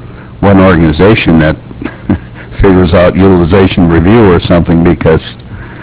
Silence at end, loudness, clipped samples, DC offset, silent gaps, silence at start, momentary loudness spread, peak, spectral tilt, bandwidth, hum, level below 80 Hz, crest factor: 0 s; -7 LUFS; 5%; 0.3%; none; 0 s; 14 LU; 0 dBFS; -11.5 dB/octave; 4 kHz; none; -20 dBFS; 6 dB